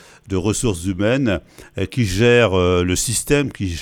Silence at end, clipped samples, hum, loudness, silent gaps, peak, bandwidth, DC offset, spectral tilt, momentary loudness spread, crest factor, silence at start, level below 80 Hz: 0 s; under 0.1%; none; -18 LUFS; none; -2 dBFS; 18.5 kHz; under 0.1%; -4.5 dB/octave; 12 LU; 16 dB; 0.25 s; -36 dBFS